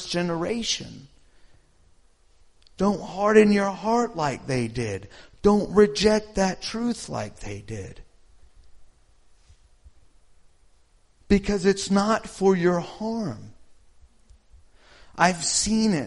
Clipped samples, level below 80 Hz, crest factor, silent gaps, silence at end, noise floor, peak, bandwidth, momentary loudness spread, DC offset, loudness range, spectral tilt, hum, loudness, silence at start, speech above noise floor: under 0.1%; -46 dBFS; 22 dB; none; 0 s; -58 dBFS; -2 dBFS; 11.5 kHz; 16 LU; under 0.1%; 10 LU; -4.5 dB/octave; none; -23 LUFS; 0 s; 35 dB